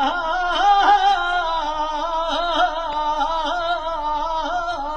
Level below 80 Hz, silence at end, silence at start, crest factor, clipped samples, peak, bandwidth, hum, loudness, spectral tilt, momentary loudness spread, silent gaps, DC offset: -38 dBFS; 0 s; 0 s; 16 dB; under 0.1%; -4 dBFS; 9.2 kHz; none; -20 LUFS; -2.5 dB/octave; 8 LU; none; under 0.1%